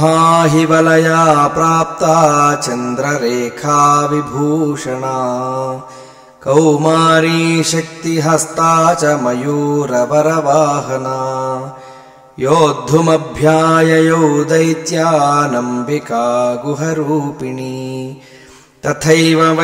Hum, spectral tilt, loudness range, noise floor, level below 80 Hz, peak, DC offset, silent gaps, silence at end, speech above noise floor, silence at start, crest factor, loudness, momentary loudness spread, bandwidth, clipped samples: none; -5 dB/octave; 4 LU; -41 dBFS; -50 dBFS; 0 dBFS; under 0.1%; none; 0 s; 29 dB; 0 s; 12 dB; -13 LUFS; 11 LU; 16 kHz; under 0.1%